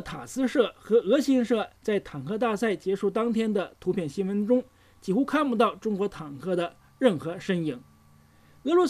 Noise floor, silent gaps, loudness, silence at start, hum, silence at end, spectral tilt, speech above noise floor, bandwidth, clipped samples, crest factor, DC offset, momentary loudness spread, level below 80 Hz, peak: -57 dBFS; none; -27 LUFS; 0 s; none; 0 s; -6 dB/octave; 31 dB; 14.5 kHz; under 0.1%; 18 dB; under 0.1%; 9 LU; -62 dBFS; -8 dBFS